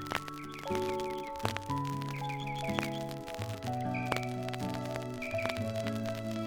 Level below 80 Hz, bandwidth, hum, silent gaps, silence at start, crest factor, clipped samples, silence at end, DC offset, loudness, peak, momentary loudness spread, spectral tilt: -60 dBFS; over 20 kHz; none; none; 0 s; 26 dB; under 0.1%; 0 s; under 0.1%; -36 LUFS; -10 dBFS; 4 LU; -5.5 dB/octave